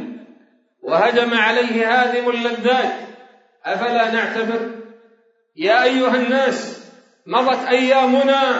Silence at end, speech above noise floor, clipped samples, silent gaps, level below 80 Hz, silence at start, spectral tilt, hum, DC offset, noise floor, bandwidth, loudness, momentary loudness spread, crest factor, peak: 0 s; 41 dB; under 0.1%; none; -84 dBFS; 0 s; -4 dB/octave; none; under 0.1%; -57 dBFS; 8 kHz; -17 LUFS; 16 LU; 16 dB; -2 dBFS